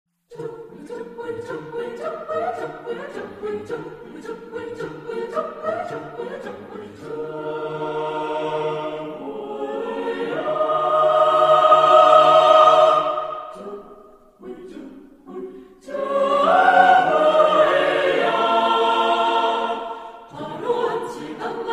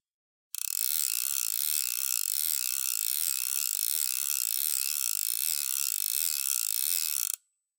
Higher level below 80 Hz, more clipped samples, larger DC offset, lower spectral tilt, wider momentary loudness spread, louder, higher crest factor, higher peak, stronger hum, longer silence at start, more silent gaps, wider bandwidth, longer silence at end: first, -62 dBFS vs under -90 dBFS; neither; neither; first, -4.5 dB/octave vs 12 dB/octave; first, 23 LU vs 2 LU; first, -18 LUFS vs -27 LUFS; about the same, 20 dB vs 24 dB; first, 0 dBFS vs -6 dBFS; neither; second, 0.3 s vs 0.6 s; neither; second, 11 kHz vs 17.5 kHz; second, 0 s vs 0.45 s